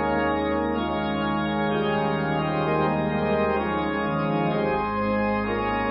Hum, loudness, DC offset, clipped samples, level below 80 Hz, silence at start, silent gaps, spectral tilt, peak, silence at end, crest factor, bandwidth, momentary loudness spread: none; -24 LUFS; under 0.1%; under 0.1%; -44 dBFS; 0 s; none; -11 dB/octave; -12 dBFS; 0 s; 12 dB; 5.4 kHz; 2 LU